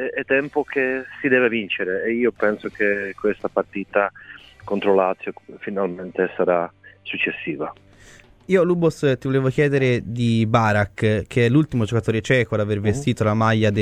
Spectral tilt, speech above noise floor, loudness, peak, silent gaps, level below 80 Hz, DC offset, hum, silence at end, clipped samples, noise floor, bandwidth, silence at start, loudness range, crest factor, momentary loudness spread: -7 dB/octave; 28 dB; -21 LUFS; -2 dBFS; none; -50 dBFS; under 0.1%; none; 0 s; under 0.1%; -48 dBFS; 10.5 kHz; 0 s; 4 LU; 18 dB; 10 LU